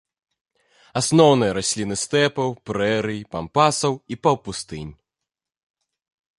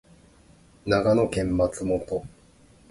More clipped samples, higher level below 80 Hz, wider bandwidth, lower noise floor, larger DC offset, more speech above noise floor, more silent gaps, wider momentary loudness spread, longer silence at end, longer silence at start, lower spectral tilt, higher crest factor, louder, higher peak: neither; second, -52 dBFS vs -46 dBFS; about the same, 11.5 kHz vs 11.5 kHz; first, -86 dBFS vs -55 dBFS; neither; first, 65 dB vs 32 dB; neither; first, 15 LU vs 12 LU; first, 1.45 s vs 0.6 s; about the same, 0.95 s vs 0.85 s; second, -4.5 dB/octave vs -6.5 dB/octave; about the same, 20 dB vs 18 dB; first, -21 LUFS vs -25 LUFS; first, -2 dBFS vs -8 dBFS